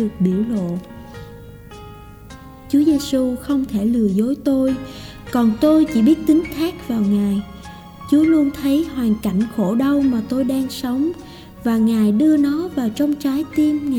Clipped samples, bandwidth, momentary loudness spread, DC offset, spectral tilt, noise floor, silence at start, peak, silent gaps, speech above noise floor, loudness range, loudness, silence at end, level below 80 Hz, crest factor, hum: under 0.1%; 19 kHz; 22 LU; under 0.1%; -7 dB/octave; -38 dBFS; 0 s; -6 dBFS; none; 21 dB; 4 LU; -18 LUFS; 0 s; -44 dBFS; 12 dB; none